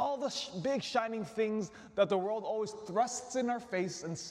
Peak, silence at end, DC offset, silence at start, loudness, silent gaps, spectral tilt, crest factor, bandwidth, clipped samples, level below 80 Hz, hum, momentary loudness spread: -16 dBFS; 0 s; under 0.1%; 0 s; -35 LUFS; none; -4 dB/octave; 18 dB; 13 kHz; under 0.1%; -74 dBFS; none; 6 LU